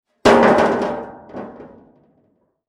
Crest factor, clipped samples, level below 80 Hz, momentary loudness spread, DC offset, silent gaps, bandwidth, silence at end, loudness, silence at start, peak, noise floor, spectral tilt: 18 dB; under 0.1%; -48 dBFS; 22 LU; under 0.1%; none; 13 kHz; 1 s; -15 LUFS; 0.25 s; -2 dBFS; -63 dBFS; -5 dB/octave